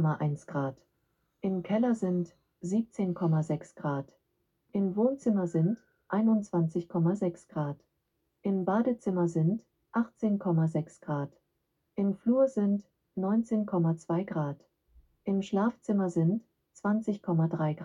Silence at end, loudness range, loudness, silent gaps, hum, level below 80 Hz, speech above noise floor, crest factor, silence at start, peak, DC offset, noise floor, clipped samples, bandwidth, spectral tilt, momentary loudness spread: 0 s; 2 LU; -30 LUFS; none; none; -70 dBFS; 50 dB; 16 dB; 0 s; -14 dBFS; under 0.1%; -79 dBFS; under 0.1%; 10 kHz; -9 dB/octave; 10 LU